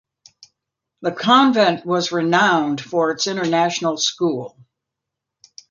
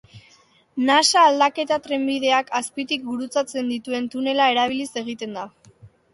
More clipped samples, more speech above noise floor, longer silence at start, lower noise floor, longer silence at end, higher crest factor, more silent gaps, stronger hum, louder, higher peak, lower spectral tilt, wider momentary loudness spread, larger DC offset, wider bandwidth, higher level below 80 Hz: neither; first, 65 dB vs 35 dB; first, 1 s vs 0.15 s; first, -83 dBFS vs -56 dBFS; first, 1.25 s vs 0.25 s; about the same, 18 dB vs 18 dB; neither; neither; first, -18 LUFS vs -21 LUFS; about the same, -2 dBFS vs -4 dBFS; first, -4 dB/octave vs -2 dB/octave; second, 10 LU vs 15 LU; neither; second, 7.4 kHz vs 11.5 kHz; about the same, -66 dBFS vs -68 dBFS